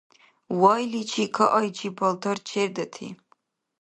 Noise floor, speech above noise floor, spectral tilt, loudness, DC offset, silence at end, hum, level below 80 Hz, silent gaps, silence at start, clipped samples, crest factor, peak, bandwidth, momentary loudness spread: -66 dBFS; 42 dB; -4.5 dB/octave; -24 LUFS; under 0.1%; 0.65 s; none; -74 dBFS; none; 0.5 s; under 0.1%; 22 dB; -4 dBFS; 10.5 kHz; 13 LU